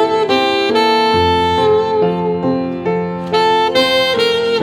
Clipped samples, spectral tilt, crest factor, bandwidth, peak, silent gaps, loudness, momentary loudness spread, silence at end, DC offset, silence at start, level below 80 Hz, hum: under 0.1%; -5 dB/octave; 12 dB; 15.5 kHz; 0 dBFS; none; -14 LUFS; 6 LU; 0 s; under 0.1%; 0 s; -44 dBFS; none